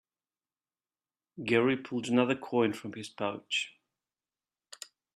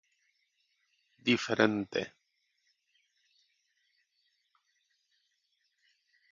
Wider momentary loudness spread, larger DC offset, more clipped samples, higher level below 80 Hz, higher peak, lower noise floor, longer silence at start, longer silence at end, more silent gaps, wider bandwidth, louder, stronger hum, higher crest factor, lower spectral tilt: first, 16 LU vs 9 LU; neither; neither; about the same, -76 dBFS vs -76 dBFS; second, -12 dBFS vs -8 dBFS; first, under -90 dBFS vs -78 dBFS; about the same, 1.35 s vs 1.25 s; second, 1.45 s vs 4.25 s; neither; first, 13 kHz vs 7.2 kHz; about the same, -31 LUFS vs -31 LUFS; neither; second, 22 dB vs 30 dB; first, -5 dB/octave vs -3 dB/octave